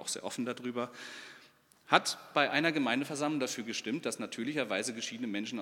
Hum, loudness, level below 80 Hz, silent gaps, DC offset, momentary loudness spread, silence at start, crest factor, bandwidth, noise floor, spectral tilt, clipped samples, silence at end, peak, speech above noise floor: none; -33 LUFS; -86 dBFS; none; under 0.1%; 11 LU; 0 s; 28 dB; 17 kHz; -62 dBFS; -3 dB/octave; under 0.1%; 0 s; -6 dBFS; 28 dB